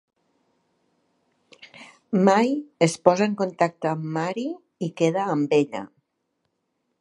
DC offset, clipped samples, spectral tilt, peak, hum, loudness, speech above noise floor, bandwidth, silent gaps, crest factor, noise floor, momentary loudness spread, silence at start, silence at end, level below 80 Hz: under 0.1%; under 0.1%; -6 dB/octave; -2 dBFS; none; -23 LUFS; 54 dB; 11.5 kHz; none; 24 dB; -76 dBFS; 14 LU; 1.75 s; 1.15 s; -74 dBFS